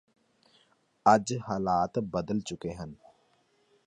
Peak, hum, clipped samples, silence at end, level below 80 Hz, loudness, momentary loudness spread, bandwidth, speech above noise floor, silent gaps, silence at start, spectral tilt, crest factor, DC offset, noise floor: -8 dBFS; none; under 0.1%; 0.9 s; -60 dBFS; -29 LUFS; 15 LU; 10 kHz; 41 dB; none; 1.05 s; -5.5 dB/octave; 24 dB; under 0.1%; -69 dBFS